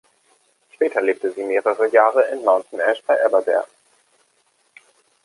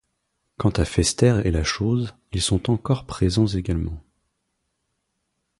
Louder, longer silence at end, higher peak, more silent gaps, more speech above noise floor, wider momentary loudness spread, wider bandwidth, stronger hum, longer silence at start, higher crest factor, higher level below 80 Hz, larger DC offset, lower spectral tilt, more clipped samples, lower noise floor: first, -19 LUFS vs -22 LUFS; about the same, 1.6 s vs 1.6 s; about the same, -2 dBFS vs -4 dBFS; neither; second, 45 dB vs 54 dB; about the same, 8 LU vs 8 LU; about the same, 11.5 kHz vs 11.5 kHz; neither; first, 0.8 s vs 0.6 s; about the same, 20 dB vs 20 dB; second, -80 dBFS vs -34 dBFS; neither; second, -3.5 dB/octave vs -5.5 dB/octave; neither; second, -63 dBFS vs -75 dBFS